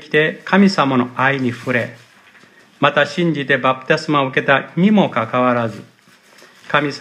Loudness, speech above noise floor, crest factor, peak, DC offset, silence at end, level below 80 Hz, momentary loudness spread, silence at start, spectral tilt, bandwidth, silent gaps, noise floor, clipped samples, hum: -16 LUFS; 32 dB; 18 dB; 0 dBFS; under 0.1%; 0 s; -64 dBFS; 7 LU; 0 s; -6.5 dB/octave; 10.5 kHz; none; -48 dBFS; under 0.1%; none